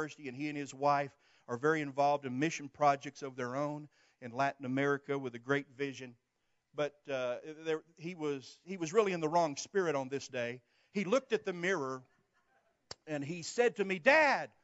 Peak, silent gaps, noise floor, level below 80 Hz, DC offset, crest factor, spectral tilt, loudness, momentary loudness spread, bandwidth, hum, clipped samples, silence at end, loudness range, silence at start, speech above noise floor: -14 dBFS; none; -81 dBFS; -86 dBFS; under 0.1%; 22 dB; -4 dB/octave; -34 LUFS; 13 LU; 8 kHz; none; under 0.1%; 0.15 s; 4 LU; 0 s; 46 dB